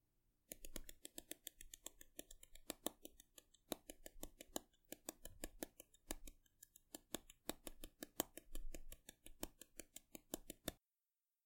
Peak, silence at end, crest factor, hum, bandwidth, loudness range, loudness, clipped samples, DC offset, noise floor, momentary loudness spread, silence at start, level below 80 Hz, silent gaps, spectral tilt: -18 dBFS; 0.7 s; 38 dB; none; 17 kHz; 2 LU; -54 LUFS; under 0.1%; under 0.1%; under -90 dBFS; 13 LU; 0.5 s; -62 dBFS; none; -2 dB/octave